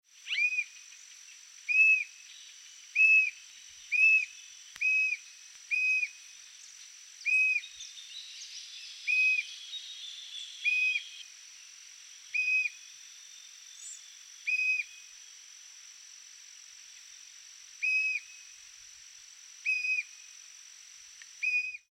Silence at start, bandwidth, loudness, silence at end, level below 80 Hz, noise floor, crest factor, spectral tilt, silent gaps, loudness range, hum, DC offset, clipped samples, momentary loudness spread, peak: 0.25 s; 15.5 kHz; -27 LUFS; 0.15 s; -88 dBFS; -52 dBFS; 18 dB; 6 dB/octave; none; 10 LU; none; under 0.1%; under 0.1%; 25 LU; -16 dBFS